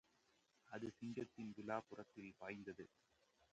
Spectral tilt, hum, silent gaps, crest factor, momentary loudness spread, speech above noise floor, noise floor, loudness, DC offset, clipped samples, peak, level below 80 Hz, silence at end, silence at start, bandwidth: -6.5 dB/octave; none; none; 24 dB; 10 LU; 28 dB; -80 dBFS; -52 LUFS; under 0.1%; under 0.1%; -30 dBFS; -84 dBFS; 0.65 s; 0.65 s; 8.8 kHz